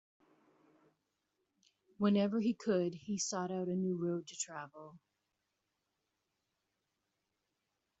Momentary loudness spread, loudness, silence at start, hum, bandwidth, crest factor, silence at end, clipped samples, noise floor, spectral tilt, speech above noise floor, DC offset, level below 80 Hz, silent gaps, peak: 10 LU; -36 LUFS; 2 s; none; 8 kHz; 20 dB; 3.05 s; under 0.1%; -86 dBFS; -6.5 dB/octave; 50 dB; under 0.1%; -82 dBFS; none; -20 dBFS